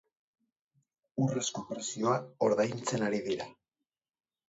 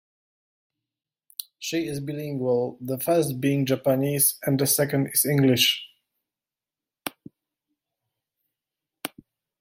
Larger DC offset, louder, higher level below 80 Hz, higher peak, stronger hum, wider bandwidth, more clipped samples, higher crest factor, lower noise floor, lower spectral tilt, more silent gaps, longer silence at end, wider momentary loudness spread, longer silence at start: neither; second, -32 LUFS vs -23 LUFS; second, -76 dBFS vs -66 dBFS; second, -16 dBFS vs -8 dBFS; neither; second, 8.2 kHz vs 16.5 kHz; neither; about the same, 20 dB vs 20 dB; about the same, under -90 dBFS vs under -90 dBFS; about the same, -5 dB/octave vs -4 dB/octave; neither; first, 0.95 s vs 0.55 s; second, 9 LU vs 17 LU; second, 1.15 s vs 1.6 s